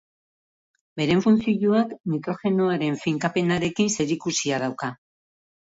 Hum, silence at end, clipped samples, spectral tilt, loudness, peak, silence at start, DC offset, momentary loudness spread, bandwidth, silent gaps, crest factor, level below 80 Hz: none; 0.7 s; under 0.1%; -5 dB/octave; -23 LUFS; -8 dBFS; 0.95 s; under 0.1%; 8 LU; 8 kHz; 2.00-2.04 s; 16 dB; -60 dBFS